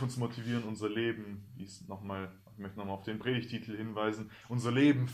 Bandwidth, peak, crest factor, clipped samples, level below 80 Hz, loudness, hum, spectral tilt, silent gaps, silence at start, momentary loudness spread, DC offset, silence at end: 13.5 kHz; -16 dBFS; 18 dB; under 0.1%; -70 dBFS; -35 LUFS; none; -6.5 dB/octave; none; 0 s; 17 LU; under 0.1%; 0 s